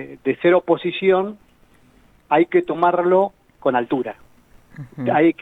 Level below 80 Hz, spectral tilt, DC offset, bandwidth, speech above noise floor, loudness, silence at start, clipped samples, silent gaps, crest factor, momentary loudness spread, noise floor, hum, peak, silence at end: -60 dBFS; -8.5 dB/octave; under 0.1%; 4 kHz; 35 dB; -19 LUFS; 0 s; under 0.1%; none; 16 dB; 10 LU; -54 dBFS; none; -4 dBFS; 0.1 s